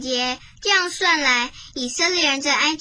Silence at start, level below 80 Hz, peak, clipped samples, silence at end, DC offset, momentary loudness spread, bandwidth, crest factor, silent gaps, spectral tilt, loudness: 0 s; -52 dBFS; -4 dBFS; under 0.1%; 0 s; under 0.1%; 9 LU; 10.5 kHz; 18 dB; none; 0 dB/octave; -19 LUFS